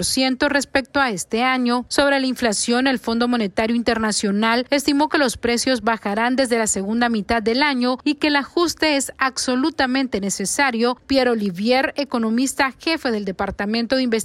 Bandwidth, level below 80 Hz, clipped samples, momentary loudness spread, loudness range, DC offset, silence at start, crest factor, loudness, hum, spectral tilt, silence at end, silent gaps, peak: 14 kHz; -48 dBFS; under 0.1%; 3 LU; 1 LU; under 0.1%; 0 s; 16 dB; -19 LUFS; none; -3 dB/octave; 0 s; none; -4 dBFS